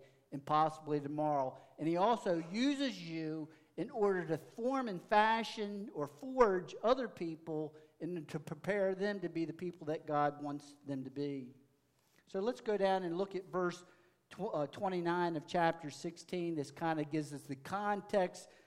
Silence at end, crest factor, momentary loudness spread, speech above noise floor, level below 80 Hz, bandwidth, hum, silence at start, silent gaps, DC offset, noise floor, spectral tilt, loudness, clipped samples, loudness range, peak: 0.2 s; 26 dB; 12 LU; 38 dB; -72 dBFS; 15 kHz; none; 0 s; none; under 0.1%; -74 dBFS; -6 dB/octave; -37 LUFS; under 0.1%; 5 LU; -12 dBFS